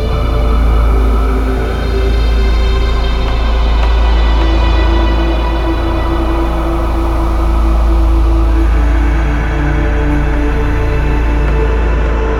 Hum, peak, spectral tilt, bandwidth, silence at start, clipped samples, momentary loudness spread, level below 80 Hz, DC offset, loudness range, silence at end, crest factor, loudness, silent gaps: none; 0 dBFS; -7 dB/octave; 6.8 kHz; 0 s; under 0.1%; 3 LU; -12 dBFS; under 0.1%; 1 LU; 0 s; 10 dB; -14 LUFS; none